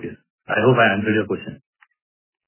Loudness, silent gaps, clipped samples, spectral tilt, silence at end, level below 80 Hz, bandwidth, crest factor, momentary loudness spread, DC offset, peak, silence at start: -19 LUFS; 0.30-0.38 s; under 0.1%; -10 dB/octave; 0.95 s; -56 dBFS; 3.2 kHz; 20 dB; 19 LU; under 0.1%; -2 dBFS; 0 s